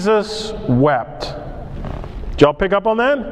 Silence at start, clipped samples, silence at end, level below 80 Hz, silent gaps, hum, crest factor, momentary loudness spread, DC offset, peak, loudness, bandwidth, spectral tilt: 0 s; under 0.1%; 0 s; -32 dBFS; none; none; 18 dB; 16 LU; under 0.1%; 0 dBFS; -17 LUFS; 10.5 kHz; -6.5 dB/octave